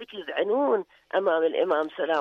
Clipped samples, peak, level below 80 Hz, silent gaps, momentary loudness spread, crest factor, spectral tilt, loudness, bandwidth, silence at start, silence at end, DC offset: under 0.1%; -12 dBFS; -76 dBFS; none; 6 LU; 12 dB; -5.5 dB/octave; -26 LUFS; 6 kHz; 0 s; 0 s; under 0.1%